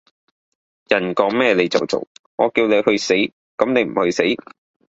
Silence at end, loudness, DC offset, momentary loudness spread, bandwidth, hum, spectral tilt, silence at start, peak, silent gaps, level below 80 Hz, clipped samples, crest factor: 0.55 s; -18 LUFS; under 0.1%; 8 LU; 8 kHz; none; -4.5 dB/octave; 0.9 s; 0 dBFS; 2.07-2.38 s, 3.32-3.58 s; -58 dBFS; under 0.1%; 18 dB